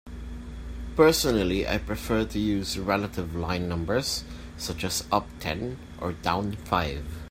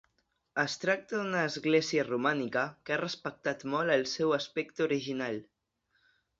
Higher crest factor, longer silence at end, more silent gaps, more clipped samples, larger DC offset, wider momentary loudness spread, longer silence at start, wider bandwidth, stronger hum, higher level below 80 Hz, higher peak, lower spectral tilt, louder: about the same, 22 dB vs 20 dB; second, 0 s vs 0.95 s; neither; neither; neither; first, 15 LU vs 7 LU; second, 0.05 s vs 0.55 s; first, 16 kHz vs 7.8 kHz; neither; first, -40 dBFS vs -74 dBFS; first, -6 dBFS vs -14 dBFS; about the same, -4.5 dB/octave vs -4.5 dB/octave; first, -27 LUFS vs -31 LUFS